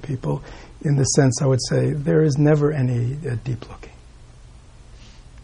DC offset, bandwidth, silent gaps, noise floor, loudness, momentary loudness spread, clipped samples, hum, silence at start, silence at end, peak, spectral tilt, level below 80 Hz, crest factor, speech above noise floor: under 0.1%; 10.5 kHz; none; -44 dBFS; -20 LUFS; 14 LU; under 0.1%; none; 0 s; 0 s; -4 dBFS; -6 dB/octave; -44 dBFS; 16 dB; 24 dB